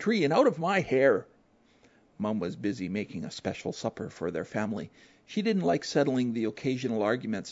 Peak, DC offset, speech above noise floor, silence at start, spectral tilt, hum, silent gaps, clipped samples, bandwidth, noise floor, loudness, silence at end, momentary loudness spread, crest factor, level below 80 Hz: -10 dBFS; under 0.1%; 35 dB; 0 s; -6 dB/octave; none; none; under 0.1%; 8 kHz; -64 dBFS; -29 LUFS; 0 s; 11 LU; 20 dB; -66 dBFS